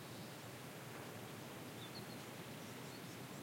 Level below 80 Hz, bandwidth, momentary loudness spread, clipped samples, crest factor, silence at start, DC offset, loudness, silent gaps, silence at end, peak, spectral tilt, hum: -84 dBFS; 16.5 kHz; 1 LU; under 0.1%; 14 dB; 0 s; under 0.1%; -51 LUFS; none; 0 s; -38 dBFS; -4 dB/octave; none